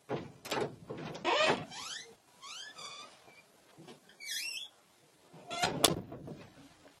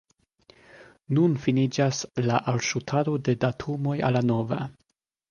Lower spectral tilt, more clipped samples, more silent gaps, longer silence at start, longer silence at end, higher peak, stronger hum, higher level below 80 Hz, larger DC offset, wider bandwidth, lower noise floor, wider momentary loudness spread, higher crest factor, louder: second, -2.5 dB/octave vs -6 dB/octave; neither; neither; second, 0.1 s vs 0.75 s; second, 0.1 s vs 0.6 s; about the same, -8 dBFS vs -8 dBFS; neither; second, -68 dBFS vs -60 dBFS; neither; first, 16 kHz vs 9.8 kHz; second, -65 dBFS vs -74 dBFS; first, 25 LU vs 6 LU; first, 30 dB vs 18 dB; second, -35 LUFS vs -25 LUFS